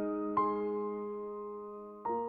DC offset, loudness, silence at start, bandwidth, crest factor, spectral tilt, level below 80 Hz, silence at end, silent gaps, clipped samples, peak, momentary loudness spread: under 0.1%; -37 LUFS; 0 s; 4.5 kHz; 16 dB; -10 dB/octave; -72 dBFS; 0 s; none; under 0.1%; -20 dBFS; 12 LU